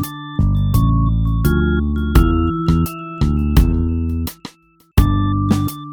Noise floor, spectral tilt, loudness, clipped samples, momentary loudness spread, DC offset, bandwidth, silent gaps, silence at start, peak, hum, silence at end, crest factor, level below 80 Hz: -49 dBFS; -7.5 dB/octave; -17 LUFS; under 0.1%; 7 LU; under 0.1%; 17.5 kHz; none; 0 s; 0 dBFS; none; 0 s; 16 dB; -20 dBFS